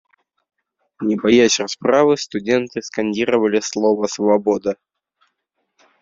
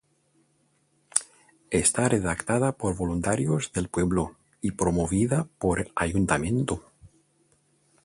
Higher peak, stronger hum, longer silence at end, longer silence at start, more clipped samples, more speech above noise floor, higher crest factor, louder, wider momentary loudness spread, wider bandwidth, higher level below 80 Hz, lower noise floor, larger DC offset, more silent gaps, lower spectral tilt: about the same, -2 dBFS vs 0 dBFS; neither; first, 1.3 s vs 1 s; second, 1 s vs 1.15 s; neither; first, 56 dB vs 43 dB; second, 18 dB vs 26 dB; first, -18 LUFS vs -26 LUFS; first, 10 LU vs 6 LU; second, 7.8 kHz vs 11.5 kHz; second, -60 dBFS vs -44 dBFS; first, -73 dBFS vs -68 dBFS; neither; neither; about the same, -4 dB/octave vs -5 dB/octave